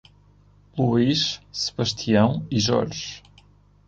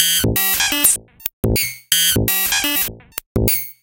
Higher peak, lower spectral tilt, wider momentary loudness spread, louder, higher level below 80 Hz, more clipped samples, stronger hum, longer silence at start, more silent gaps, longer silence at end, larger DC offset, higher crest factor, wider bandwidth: second, -6 dBFS vs 0 dBFS; first, -5 dB/octave vs -2 dB/octave; first, 14 LU vs 10 LU; second, -22 LUFS vs -16 LUFS; second, -52 dBFS vs -32 dBFS; neither; first, 50 Hz at -45 dBFS vs none; first, 0.75 s vs 0 s; second, none vs 1.33-1.43 s, 3.26-3.35 s; first, 0.7 s vs 0.1 s; neither; about the same, 18 dB vs 18 dB; second, 7.8 kHz vs 17.5 kHz